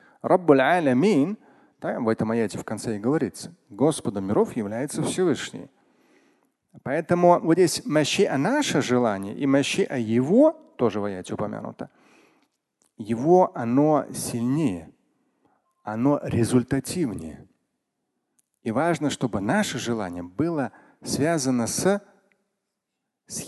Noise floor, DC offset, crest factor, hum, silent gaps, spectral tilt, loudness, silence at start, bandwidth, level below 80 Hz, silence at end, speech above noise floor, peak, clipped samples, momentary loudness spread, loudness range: -82 dBFS; under 0.1%; 22 dB; none; none; -5.5 dB/octave; -23 LUFS; 0.25 s; 12.5 kHz; -58 dBFS; 0 s; 59 dB; -4 dBFS; under 0.1%; 15 LU; 5 LU